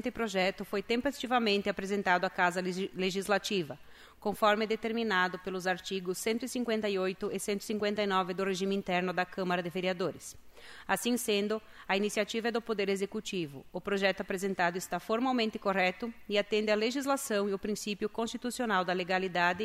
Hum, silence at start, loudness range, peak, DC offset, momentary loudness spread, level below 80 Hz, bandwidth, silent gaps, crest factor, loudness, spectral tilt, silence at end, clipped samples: none; 0.05 s; 2 LU; -12 dBFS; under 0.1%; 7 LU; -64 dBFS; 16 kHz; none; 20 dB; -32 LUFS; -4 dB/octave; 0 s; under 0.1%